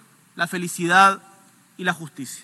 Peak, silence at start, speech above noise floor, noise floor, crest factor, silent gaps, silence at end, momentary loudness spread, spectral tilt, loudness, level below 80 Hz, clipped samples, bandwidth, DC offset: -2 dBFS; 0.35 s; 32 dB; -53 dBFS; 20 dB; none; 0.05 s; 17 LU; -3.5 dB/octave; -20 LUFS; -86 dBFS; under 0.1%; 12.5 kHz; under 0.1%